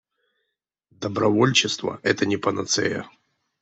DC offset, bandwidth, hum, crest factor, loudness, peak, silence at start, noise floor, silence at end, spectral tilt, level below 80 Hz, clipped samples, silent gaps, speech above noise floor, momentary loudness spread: under 0.1%; 8.4 kHz; none; 20 dB; -22 LUFS; -4 dBFS; 1 s; -80 dBFS; 0.55 s; -3.5 dB/octave; -64 dBFS; under 0.1%; none; 58 dB; 11 LU